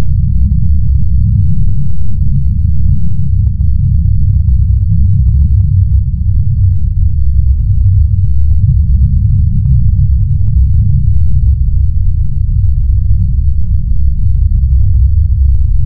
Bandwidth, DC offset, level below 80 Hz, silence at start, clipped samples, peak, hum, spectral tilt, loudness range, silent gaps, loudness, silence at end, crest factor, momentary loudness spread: 0.5 kHz; under 0.1%; -10 dBFS; 0 s; 0.4%; 0 dBFS; none; -12.5 dB/octave; 2 LU; none; -12 LUFS; 0 s; 8 dB; 4 LU